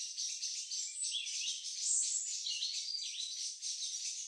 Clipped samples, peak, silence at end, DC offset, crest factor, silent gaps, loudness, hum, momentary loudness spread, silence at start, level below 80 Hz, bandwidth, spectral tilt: under 0.1%; -20 dBFS; 0 s; under 0.1%; 20 dB; none; -36 LUFS; none; 6 LU; 0 s; under -90 dBFS; 15.5 kHz; 12 dB/octave